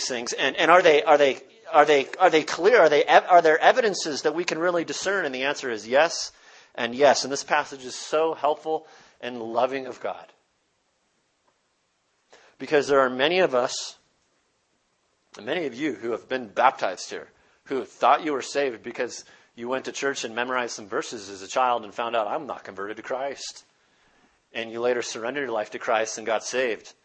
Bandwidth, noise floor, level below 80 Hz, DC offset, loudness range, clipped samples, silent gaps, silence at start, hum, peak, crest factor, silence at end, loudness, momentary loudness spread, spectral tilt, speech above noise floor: 8.8 kHz; -71 dBFS; -72 dBFS; under 0.1%; 12 LU; under 0.1%; none; 0 s; none; 0 dBFS; 24 dB; 0.15 s; -23 LUFS; 17 LU; -2.5 dB/octave; 48 dB